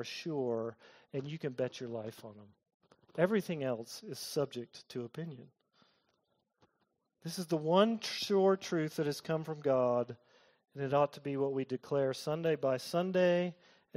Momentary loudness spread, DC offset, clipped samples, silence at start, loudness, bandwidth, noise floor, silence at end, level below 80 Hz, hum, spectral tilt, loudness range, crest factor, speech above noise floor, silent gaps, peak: 15 LU; under 0.1%; under 0.1%; 0 s; -35 LUFS; 16 kHz; -81 dBFS; 0.45 s; -80 dBFS; none; -5.5 dB/octave; 10 LU; 22 dB; 46 dB; 2.74-2.80 s; -14 dBFS